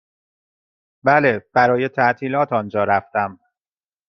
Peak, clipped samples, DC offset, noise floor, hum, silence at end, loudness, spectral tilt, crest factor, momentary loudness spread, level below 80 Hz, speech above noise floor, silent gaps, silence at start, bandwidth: -2 dBFS; under 0.1%; under 0.1%; under -90 dBFS; none; 0.75 s; -18 LUFS; -7.5 dB/octave; 20 dB; 8 LU; -62 dBFS; over 72 dB; none; 1.05 s; 6.2 kHz